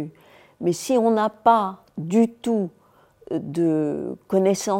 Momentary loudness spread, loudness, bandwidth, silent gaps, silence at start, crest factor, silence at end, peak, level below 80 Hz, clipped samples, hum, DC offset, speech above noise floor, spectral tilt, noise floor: 12 LU; -22 LUFS; 16.5 kHz; none; 0 s; 20 dB; 0 s; -4 dBFS; -66 dBFS; under 0.1%; none; under 0.1%; 29 dB; -6 dB/octave; -50 dBFS